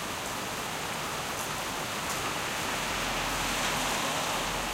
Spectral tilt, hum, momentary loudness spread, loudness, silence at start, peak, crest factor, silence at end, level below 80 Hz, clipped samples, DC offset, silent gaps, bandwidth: -2 dB/octave; none; 5 LU; -30 LUFS; 0 s; -18 dBFS; 14 dB; 0 s; -50 dBFS; under 0.1%; under 0.1%; none; 16.5 kHz